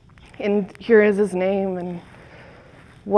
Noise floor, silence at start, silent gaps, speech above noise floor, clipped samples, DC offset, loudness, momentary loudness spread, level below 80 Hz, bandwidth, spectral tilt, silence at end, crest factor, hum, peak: -47 dBFS; 0.4 s; none; 27 dB; under 0.1%; under 0.1%; -20 LUFS; 17 LU; -56 dBFS; 10.5 kHz; -7.5 dB/octave; 0 s; 20 dB; none; -2 dBFS